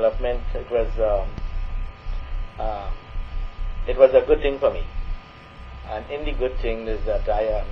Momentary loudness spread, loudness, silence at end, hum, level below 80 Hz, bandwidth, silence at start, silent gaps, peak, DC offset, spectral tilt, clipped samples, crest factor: 18 LU; -24 LUFS; 0 s; none; -28 dBFS; 5.8 kHz; 0 s; none; 0 dBFS; under 0.1%; -8 dB/octave; under 0.1%; 22 dB